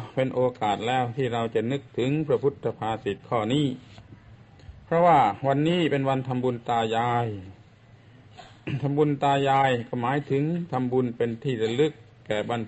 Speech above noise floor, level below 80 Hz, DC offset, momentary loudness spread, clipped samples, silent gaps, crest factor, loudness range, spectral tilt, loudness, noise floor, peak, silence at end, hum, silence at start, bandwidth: 28 dB; -58 dBFS; under 0.1%; 8 LU; under 0.1%; none; 16 dB; 4 LU; -7 dB/octave; -25 LUFS; -53 dBFS; -10 dBFS; 0 s; none; 0 s; 8.4 kHz